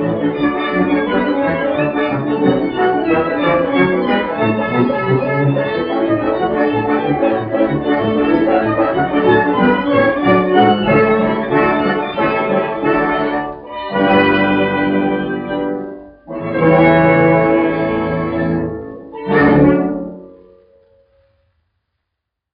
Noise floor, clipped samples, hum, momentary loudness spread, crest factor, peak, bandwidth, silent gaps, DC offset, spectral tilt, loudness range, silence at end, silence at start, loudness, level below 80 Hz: -78 dBFS; under 0.1%; none; 9 LU; 14 dB; 0 dBFS; 5.2 kHz; none; under 0.1%; -5 dB/octave; 4 LU; 2.25 s; 0 s; -15 LUFS; -44 dBFS